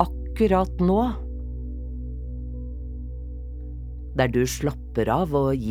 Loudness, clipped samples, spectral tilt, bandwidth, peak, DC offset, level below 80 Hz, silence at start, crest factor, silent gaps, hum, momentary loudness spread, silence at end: -26 LUFS; under 0.1%; -6.5 dB/octave; 15.5 kHz; -4 dBFS; under 0.1%; -32 dBFS; 0 s; 20 dB; none; 60 Hz at -60 dBFS; 15 LU; 0 s